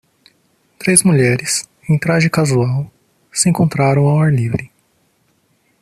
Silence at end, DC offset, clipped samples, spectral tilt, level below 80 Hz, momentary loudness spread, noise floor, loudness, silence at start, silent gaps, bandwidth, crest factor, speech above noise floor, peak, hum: 1.15 s; under 0.1%; under 0.1%; -5 dB/octave; -50 dBFS; 10 LU; -60 dBFS; -15 LUFS; 0.8 s; none; 13.5 kHz; 16 dB; 46 dB; 0 dBFS; none